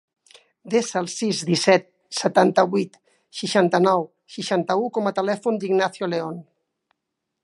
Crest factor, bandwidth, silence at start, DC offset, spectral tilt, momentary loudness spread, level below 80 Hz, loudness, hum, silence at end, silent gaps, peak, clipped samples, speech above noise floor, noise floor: 20 dB; 11.5 kHz; 0.65 s; under 0.1%; -4.5 dB/octave; 13 LU; -74 dBFS; -22 LUFS; none; 1 s; none; -2 dBFS; under 0.1%; 60 dB; -81 dBFS